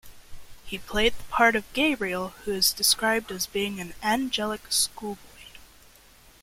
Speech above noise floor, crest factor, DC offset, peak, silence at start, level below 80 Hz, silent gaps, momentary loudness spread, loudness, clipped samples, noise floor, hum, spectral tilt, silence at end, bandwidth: 28 dB; 22 dB; under 0.1%; -6 dBFS; 0.05 s; -48 dBFS; none; 12 LU; -25 LUFS; under 0.1%; -54 dBFS; none; -2 dB/octave; 0.75 s; 16.5 kHz